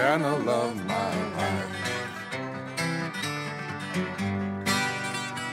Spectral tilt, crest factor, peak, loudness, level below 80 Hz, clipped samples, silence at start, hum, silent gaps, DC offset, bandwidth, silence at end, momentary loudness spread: -4.5 dB/octave; 20 dB; -10 dBFS; -29 LUFS; -66 dBFS; under 0.1%; 0 s; none; none; under 0.1%; 16 kHz; 0 s; 8 LU